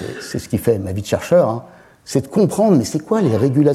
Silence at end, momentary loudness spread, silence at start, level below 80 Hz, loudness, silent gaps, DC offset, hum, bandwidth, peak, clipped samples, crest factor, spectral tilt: 0 s; 8 LU; 0 s; -50 dBFS; -17 LUFS; none; under 0.1%; none; 15.5 kHz; -2 dBFS; under 0.1%; 14 dB; -7 dB/octave